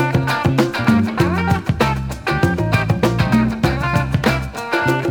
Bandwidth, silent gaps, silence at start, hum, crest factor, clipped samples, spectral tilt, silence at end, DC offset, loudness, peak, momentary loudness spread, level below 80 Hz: 19.5 kHz; none; 0 s; none; 14 dB; under 0.1%; -6.5 dB/octave; 0 s; under 0.1%; -17 LUFS; -2 dBFS; 3 LU; -34 dBFS